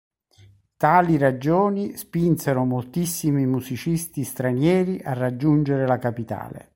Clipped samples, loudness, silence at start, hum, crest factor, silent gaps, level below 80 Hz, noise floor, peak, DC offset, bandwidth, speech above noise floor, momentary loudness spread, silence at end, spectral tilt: under 0.1%; -22 LUFS; 0.8 s; none; 18 dB; none; -54 dBFS; -54 dBFS; -4 dBFS; under 0.1%; 16.5 kHz; 32 dB; 9 LU; 0.15 s; -7 dB/octave